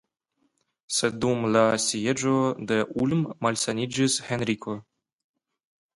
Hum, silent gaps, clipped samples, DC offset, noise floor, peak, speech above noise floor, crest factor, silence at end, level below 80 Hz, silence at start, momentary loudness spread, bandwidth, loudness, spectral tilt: none; none; under 0.1%; under 0.1%; -73 dBFS; -6 dBFS; 48 dB; 20 dB; 1.15 s; -62 dBFS; 0.9 s; 7 LU; 11.5 kHz; -25 LUFS; -4 dB/octave